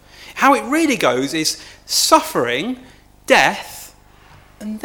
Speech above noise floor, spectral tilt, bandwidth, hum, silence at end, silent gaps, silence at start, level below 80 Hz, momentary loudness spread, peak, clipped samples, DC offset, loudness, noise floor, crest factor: 30 dB; -2.5 dB/octave; 19.5 kHz; 50 Hz at -50 dBFS; 0 s; none; 0.2 s; -52 dBFS; 20 LU; 0 dBFS; under 0.1%; under 0.1%; -16 LUFS; -46 dBFS; 18 dB